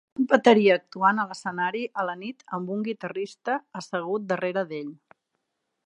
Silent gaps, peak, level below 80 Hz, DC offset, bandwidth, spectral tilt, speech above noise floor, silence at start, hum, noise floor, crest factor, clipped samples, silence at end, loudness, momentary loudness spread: none; -2 dBFS; -78 dBFS; under 0.1%; 10.5 kHz; -5.5 dB/octave; 54 dB; 0.2 s; none; -79 dBFS; 24 dB; under 0.1%; 0.9 s; -25 LUFS; 15 LU